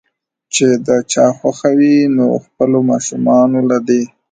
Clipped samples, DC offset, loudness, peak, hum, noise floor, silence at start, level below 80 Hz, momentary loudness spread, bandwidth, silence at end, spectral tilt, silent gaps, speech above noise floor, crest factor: under 0.1%; under 0.1%; -13 LUFS; 0 dBFS; none; -51 dBFS; 0.55 s; -58 dBFS; 6 LU; 9.4 kHz; 0.25 s; -5 dB/octave; none; 39 dB; 12 dB